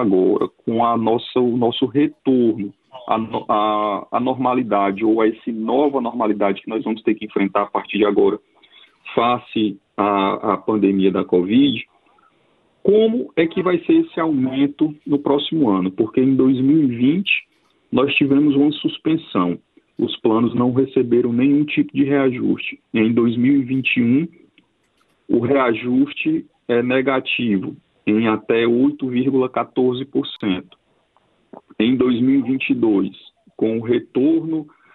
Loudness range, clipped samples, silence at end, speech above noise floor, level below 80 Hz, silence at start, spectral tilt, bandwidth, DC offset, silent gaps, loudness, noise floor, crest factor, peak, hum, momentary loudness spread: 3 LU; under 0.1%; 0.3 s; 45 dB; -60 dBFS; 0 s; -10 dB/octave; 4.2 kHz; under 0.1%; none; -18 LUFS; -63 dBFS; 16 dB; -2 dBFS; none; 7 LU